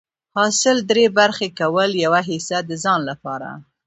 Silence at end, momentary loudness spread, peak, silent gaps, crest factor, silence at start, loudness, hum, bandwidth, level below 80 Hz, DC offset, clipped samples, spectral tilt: 0.25 s; 13 LU; -2 dBFS; none; 18 dB; 0.35 s; -18 LUFS; none; 8.2 kHz; -66 dBFS; under 0.1%; under 0.1%; -3 dB/octave